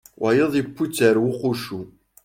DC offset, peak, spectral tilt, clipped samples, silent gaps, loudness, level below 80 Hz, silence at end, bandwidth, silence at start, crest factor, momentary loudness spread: under 0.1%; -4 dBFS; -5.5 dB/octave; under 0.1%; none; -21 LUFS; -58 dBFS; 0.35 s; 16.5 kHz; 0.2 s; 18 dB; 12 LU